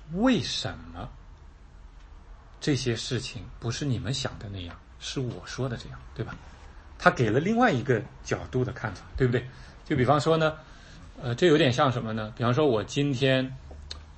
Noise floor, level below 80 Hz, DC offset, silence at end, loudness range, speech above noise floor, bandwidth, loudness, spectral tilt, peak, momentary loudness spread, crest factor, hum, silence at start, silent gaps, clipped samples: -49 dBFS; -48 dBFS; under 0.1%; 0 s; 8 LU; 22 dB; 8.8 kHz; -27 LUFS; -5.5 dB/octave; -4 dBFS; 19 LU; 24 dB; none; 0 s; none; under 0.1%